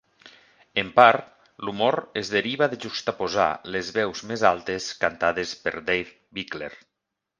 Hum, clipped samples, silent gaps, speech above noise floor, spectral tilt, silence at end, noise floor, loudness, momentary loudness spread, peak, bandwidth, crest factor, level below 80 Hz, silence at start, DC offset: none; under 0.1%; none; 59 dB; -4 dB/octave; 0.65 s; -83 dBFS; -24 LUFS; 16 LU; 0 dBFS; 9.8 kHz; 24 dB; -60 dBFS; 0.25 s; under 0.1%